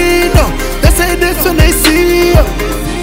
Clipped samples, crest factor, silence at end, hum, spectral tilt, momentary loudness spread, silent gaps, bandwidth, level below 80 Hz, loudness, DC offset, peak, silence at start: 0.4%; 10 dB; 0 s; none; -4.5 dB/octave; 7 LU; none; 16.5 kHz; -14 dBFS; -10 LUFS; under 0.1%; 0 dBFS; 0 s